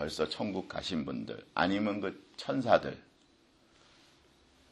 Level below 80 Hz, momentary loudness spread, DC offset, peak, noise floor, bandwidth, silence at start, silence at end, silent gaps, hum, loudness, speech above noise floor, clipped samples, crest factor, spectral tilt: -64 dBFS; 13 LU; under 0.1%; -10 dBFS; -66 dBFS; 12 kHz; 0 s; 1.7 s; none; none; -33 LUFS; 33 dB; under 0.1%; 26 dB; -5.5 dB/octave